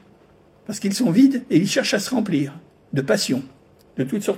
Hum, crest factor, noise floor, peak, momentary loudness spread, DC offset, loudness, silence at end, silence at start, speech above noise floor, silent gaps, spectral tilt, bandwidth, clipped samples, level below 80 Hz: none; 18 dB; -53 dBFS; -4 dBFS; 13 LU; under 0.1%; -21 LUFS; 0 s; 0.7 s; 33 dB; none; -5 dB/octave; 16 kHz; under 0.1%; -64 dBFS